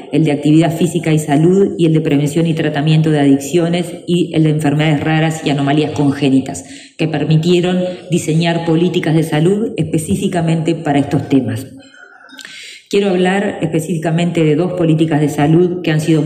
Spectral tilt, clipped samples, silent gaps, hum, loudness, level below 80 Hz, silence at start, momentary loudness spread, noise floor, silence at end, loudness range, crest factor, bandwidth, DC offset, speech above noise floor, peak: -6.5 dB/octave; under 0.1%; none; none; -14 LUFS; -54 dBFS; 0 s; 6 LU; -38 dBFS; 0 s; 4 LU; 12 dB; 15 kHz; under 0.1%; 24 dB; 0 dBFS